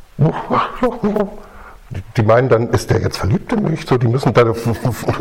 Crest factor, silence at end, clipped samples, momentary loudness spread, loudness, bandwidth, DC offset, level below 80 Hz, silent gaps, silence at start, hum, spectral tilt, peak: 16 dB; 0 s; under 0.1%; 7 LU; -16 LUFS; 16 kHz; under 0.1%; -38 dBFS; none; 0.15 s; none; -7 dB/octave; 0 dBFS